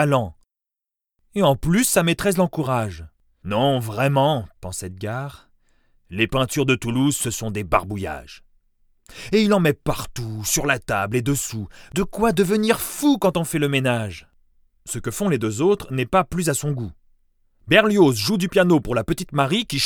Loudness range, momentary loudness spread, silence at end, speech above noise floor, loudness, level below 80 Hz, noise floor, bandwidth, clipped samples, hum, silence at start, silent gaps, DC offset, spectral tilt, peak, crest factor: 4 LU; 14 LU; 0 s; 67 dB; -21 LUFS; -44 dBFS; -87 dBFS; over 20 kHz; under 0.1%; none; 0 s; none; under 0.1%; -5 dB/octave; 0 dBFS; 22 dB